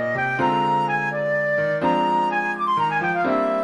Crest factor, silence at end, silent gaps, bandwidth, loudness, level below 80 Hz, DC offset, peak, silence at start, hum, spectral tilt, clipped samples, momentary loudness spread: 12 dB; 0 s; none; 11 kHz; -21 LUFS; -62 dBFS; under 0.1%; -8 dBFS; 0 s; none; -6.5 dB/octave; under 0.1%; 2 LU